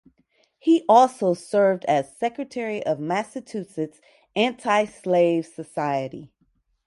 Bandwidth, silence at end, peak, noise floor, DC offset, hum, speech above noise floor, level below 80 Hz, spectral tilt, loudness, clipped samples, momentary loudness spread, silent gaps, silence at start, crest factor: 11.5 kHz; 0.6 s; -4 dBFS; -68 dBFS; under 0.1%; none; 45 dB; -70 dBFS; -5.5 dB/octave; -23 LUFS; under 0.1%; 16 LU; none; 0.65 s; 20 dB